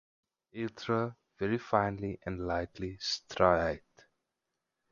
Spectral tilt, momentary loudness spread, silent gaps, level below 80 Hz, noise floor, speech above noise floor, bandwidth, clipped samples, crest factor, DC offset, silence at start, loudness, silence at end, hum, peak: -5.5 dB/octave; 13 LU; none; -54 dBFS; -86 dBFS; 54 dB; 7.6 kHz; under 0.1%; 24 dB; under 0.1%; 0.55 s; -33 LUFS; 1.1 s; none; -10 dBFS